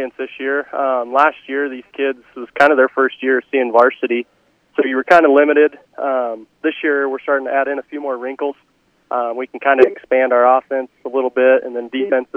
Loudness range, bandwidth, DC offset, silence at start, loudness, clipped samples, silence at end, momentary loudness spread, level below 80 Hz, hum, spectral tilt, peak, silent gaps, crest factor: 6 LU; 8.2 kHz; under 0.1%; 0 s; -16 LUFS; under 0.1%; 0.1 s; 12 LU; -66 dBFS; none; -5 dB/octave; 0 dBFS; none; 16 dB